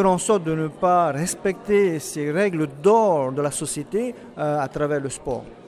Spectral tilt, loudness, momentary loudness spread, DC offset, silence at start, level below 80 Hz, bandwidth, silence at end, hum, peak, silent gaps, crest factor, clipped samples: -5.5 dB/octave; -22 LUFS; 9 LU; under 0.1%; 0 s; -52 dBFS; 14.5 kHz; 0 s; none; -6 dBFS; none; 16 dB; under 0.1%